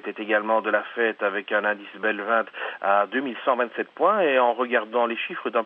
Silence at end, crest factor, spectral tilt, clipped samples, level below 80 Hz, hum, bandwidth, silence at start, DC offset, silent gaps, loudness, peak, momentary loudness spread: 0 s; 18 dB; -7 dB/octave; under 0.1%; under -90 dBFS; none; 4.3 kHz; 0.05 s; under 0.1%; none; -24 LUFS; -6 dBFS; 7 LU